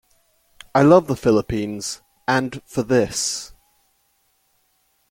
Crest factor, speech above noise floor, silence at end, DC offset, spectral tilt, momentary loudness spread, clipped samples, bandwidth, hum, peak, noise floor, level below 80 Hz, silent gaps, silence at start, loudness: 20 dB; 47 dB; 1.65 s; under 0.1%; -5 dB/octave; 15 LU; under 0.1%; 17 kHz; none; -2 dBFS; -65 dBFS; -48 dBFS; none; 0.75 s; -20 LUFS